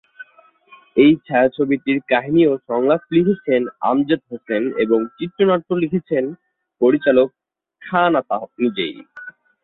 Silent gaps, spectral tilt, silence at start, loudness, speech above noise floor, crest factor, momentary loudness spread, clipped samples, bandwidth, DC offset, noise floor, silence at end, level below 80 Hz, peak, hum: none; -11 dB/octave; 0.2 s; -18 LUFS; 35 dB; 16 dB; 10 LU; under 0.1%; 4.2 kHz; under 0.1%; -52 dBFS; 0.35 s; -60 dBFS; -2 dBFS; none